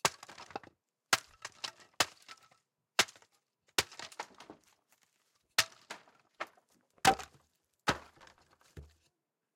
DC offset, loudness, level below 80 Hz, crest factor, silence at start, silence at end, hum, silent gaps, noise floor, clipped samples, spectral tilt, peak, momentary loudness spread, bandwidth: under 0.1%; -34 LUFS; -66 dBFS; 28 dB; 0.05 s; 0.75 s; none; none; -81 dBFS; under 0.1%; -1 dB/octave; -12 dBFS; 24 LU; 16.5 kHz